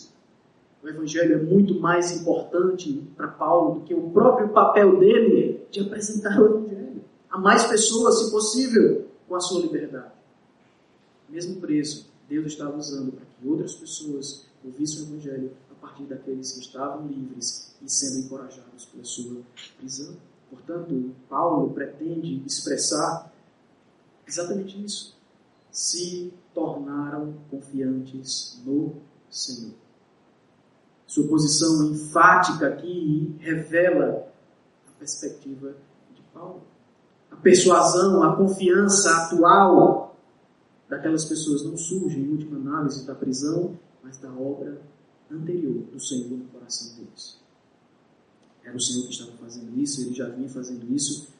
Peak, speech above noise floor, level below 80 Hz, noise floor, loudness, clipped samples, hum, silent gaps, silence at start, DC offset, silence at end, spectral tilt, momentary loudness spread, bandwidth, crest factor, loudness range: -2 dBFS; 38 dB; -70 dBFS; -60 dBFS; -22 LUFS; under 0.1%; none; none; 0 s; under 0.1%; 0.15 s; -4 dB/octave; 21 LU; 11 kHz; 22 dB; 14 LU